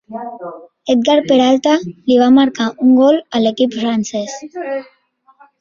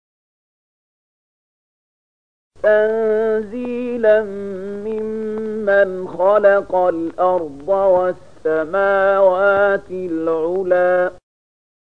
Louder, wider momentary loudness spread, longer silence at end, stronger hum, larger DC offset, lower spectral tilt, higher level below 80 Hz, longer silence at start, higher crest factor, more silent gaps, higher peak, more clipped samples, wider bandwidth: first, -14 LUFS vs -17 LUFS; first, 17 LU vs 10 LU; about the same, 0.75 s vs 0.8 s; neither; second, under 0.1% vs 0.8%; second, -4.5 dB/octave vs -7.5 dB/octave; about the same, -58 dBFS vs -54 dBFS; second, 0.1 s vs 2.65 s; about the same, 14 dB vs 16 dB; neither; about the same, -2 dBFS vs -2 dBFS; neither; first, 7.4 kHz vs 5.6 kHz